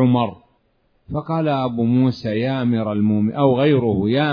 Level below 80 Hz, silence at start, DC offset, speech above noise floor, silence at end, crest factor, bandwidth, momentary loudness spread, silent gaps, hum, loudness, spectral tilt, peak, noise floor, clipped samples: -52 dBFS; 0 s; under 0.1%; 45 dB; 0 s; 16 dB; 5.4 kHz; 7 LU; none; none; -19 LUFS; -9.5 dB/octave; -4 dBFS; -63 dBFS; under 0.1%